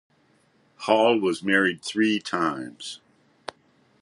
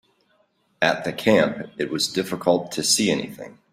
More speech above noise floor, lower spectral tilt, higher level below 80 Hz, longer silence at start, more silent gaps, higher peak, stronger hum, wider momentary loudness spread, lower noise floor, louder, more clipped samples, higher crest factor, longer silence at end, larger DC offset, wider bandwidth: about the same, 40 dB vs 43 dB; first, -4.5 dB/octave vs -3 dB/octave; second, -70 dBFS vs -62 dBFS; about the same, 0.8 s vs 0.8 s; neither; about the same, -4 dBFS vs -2 dBFS; neither; first, 21 LU vs 10 LU; about the same, -63 dBFS vs -65 dBFS; about the same, -23 LUFS vs -22 LUFS; neither; about the same, 20 dB vs 20 dB; first, 1.05 s vs 0.2 s; neither; second, 11.5 kHz vs 16 kHz